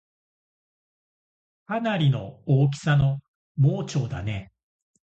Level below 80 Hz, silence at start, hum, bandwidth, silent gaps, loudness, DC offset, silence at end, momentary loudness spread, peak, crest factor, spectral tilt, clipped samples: -50 dBFS; 1.7 s; none; 8.2 kHz; 3.28-3.55 s; -25 LUFS; under 0.1%; 0.6 s; 11 LU; -8 dBFS; 18 dB; -7 dB/octave; under 0.1%